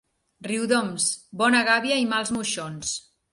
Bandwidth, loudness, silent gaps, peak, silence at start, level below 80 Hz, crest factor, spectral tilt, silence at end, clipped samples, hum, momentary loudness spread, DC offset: 11.5 kHz; -23 LUFS; none; -6 dBFS; 0.4 s; -64 dBFS; 18 dB; -2.5 dB/octave; 0.35 s; under 0.1%; none; 11 LU; under 0.1%